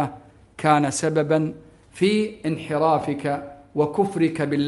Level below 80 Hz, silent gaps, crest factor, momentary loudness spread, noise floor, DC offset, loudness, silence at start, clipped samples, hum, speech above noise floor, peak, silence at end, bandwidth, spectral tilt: -58 dBFS; none; 20 dB; 9 LU; -45 dBFS; under 0.1%; -23 LUFS; 0 s; under 0.1%; none; 23 dB; -4 dBFS; 0 s; 11.5 kHz; -5.5 dB/octave